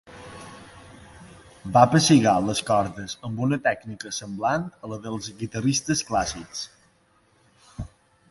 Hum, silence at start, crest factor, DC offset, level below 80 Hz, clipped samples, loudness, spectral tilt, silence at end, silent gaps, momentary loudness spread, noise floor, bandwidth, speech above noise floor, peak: none; 0.1 s; 22 dB; under 0.1%; -52 dBFS; under 0.1%; -23 LUFS; -4.5 dB/octave; 0.45 s; none; 24 LU; -62 dBFS; 11.5 kHz; 39 dB; -4 dBFS